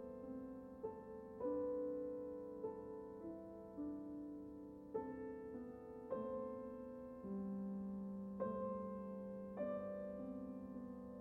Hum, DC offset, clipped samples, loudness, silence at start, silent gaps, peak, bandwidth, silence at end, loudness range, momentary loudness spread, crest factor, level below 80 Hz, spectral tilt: none; under 0.1%; under 0.1%; -49 LUFS; 0 s; none; -32 dBFS; 4.4 kHz; 0 s; 3 LU; 8 LU; 16 dB; -72 dBFS; -10.5 dB/octave